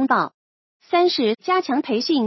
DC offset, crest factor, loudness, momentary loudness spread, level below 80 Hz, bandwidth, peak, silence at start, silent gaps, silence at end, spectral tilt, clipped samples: under 0.1%; 16 dB; -21 LUFS; 4 LU; -78 dBFS; 6.2 kHz; -4 dBFS; 0 s; 0.34-0.80 s; 0 s; -5 dB/octave; under 0.1%